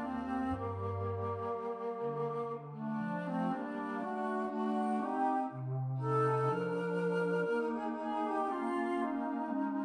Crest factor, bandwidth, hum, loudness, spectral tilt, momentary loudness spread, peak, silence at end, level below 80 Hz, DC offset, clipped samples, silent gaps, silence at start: 14 dB; 10 kHz; none; -36 LUFS; -8.5 dB/octave; 5 LU; -20 dBFS; 0 s; -68 dBFS; under 0.1%; under 0.1%; none; 0 s